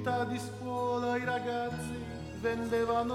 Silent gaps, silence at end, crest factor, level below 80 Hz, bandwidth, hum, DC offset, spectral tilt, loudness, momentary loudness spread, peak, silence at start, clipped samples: none; 0 s; 14 dB; -56 dBFS; 15 kHz; none; under 0.1%; -6 dB/octave; -34 LUFS; 8 LU; -18 dBFS; 0 s; under 0.1%